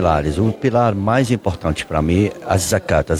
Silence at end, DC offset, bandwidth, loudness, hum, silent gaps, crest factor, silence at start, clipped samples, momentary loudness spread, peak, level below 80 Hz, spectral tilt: 0 s; under 0.1%; 15.5 kHz; -18 LUFS; none; none; 14 dB; 0 s; under 0.1%; 4 LU; -2 dBFS; -32 dBFS; -6 dB/octave